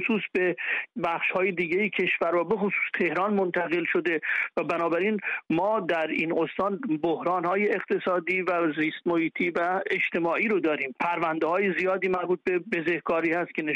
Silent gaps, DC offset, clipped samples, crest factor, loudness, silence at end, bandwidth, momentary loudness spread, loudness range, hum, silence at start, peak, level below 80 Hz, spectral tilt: none; under 0.1%; under 0.1%; 12 dB; -26 LUFS; 0 s; 7.6 kHz; 3 LU; 1 LU; none; 0 s; -14 dBFS; -68 dBFS; -7 dB/octave